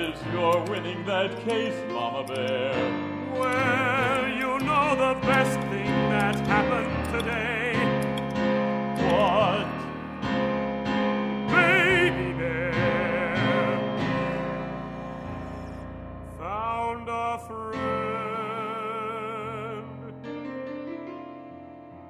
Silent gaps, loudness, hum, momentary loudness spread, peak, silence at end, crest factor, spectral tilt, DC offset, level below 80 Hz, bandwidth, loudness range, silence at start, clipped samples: none; -26 LUFS; none; 14 LU; -8 dBFS; 0 s; 20 dB; -6 dB/octave; under 0.1%; -48 dBFS; 15.5 kHz; 9 LU; 0 s; under 0.1%